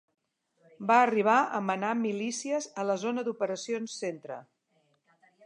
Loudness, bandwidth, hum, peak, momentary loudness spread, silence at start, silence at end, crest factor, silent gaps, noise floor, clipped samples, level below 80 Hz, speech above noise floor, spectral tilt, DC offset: -29 LUFS; 11 kHz; none; -8 dBFS; 13 LU; 0.8 s; 1.05 s; 22 dB; none; -72 dBFS; under 0.1%; -88 dBFS; 44 dB; -4 dB/octave; under 0.1%